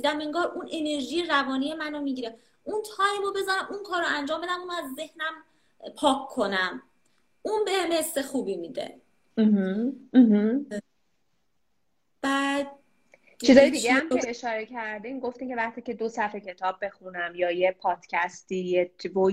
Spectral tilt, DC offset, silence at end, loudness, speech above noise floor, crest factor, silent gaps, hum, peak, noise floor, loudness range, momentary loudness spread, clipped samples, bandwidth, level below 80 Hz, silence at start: -4.5 dB/octave; under 0.1%; 0 s; -26 LUFS; 52 dB; 24 dB; none; none; -4 dBFS; -78 dBFS; 6 LU; 13 LU; under 0.1%; 16 kHz; -66 dBFS; 0 s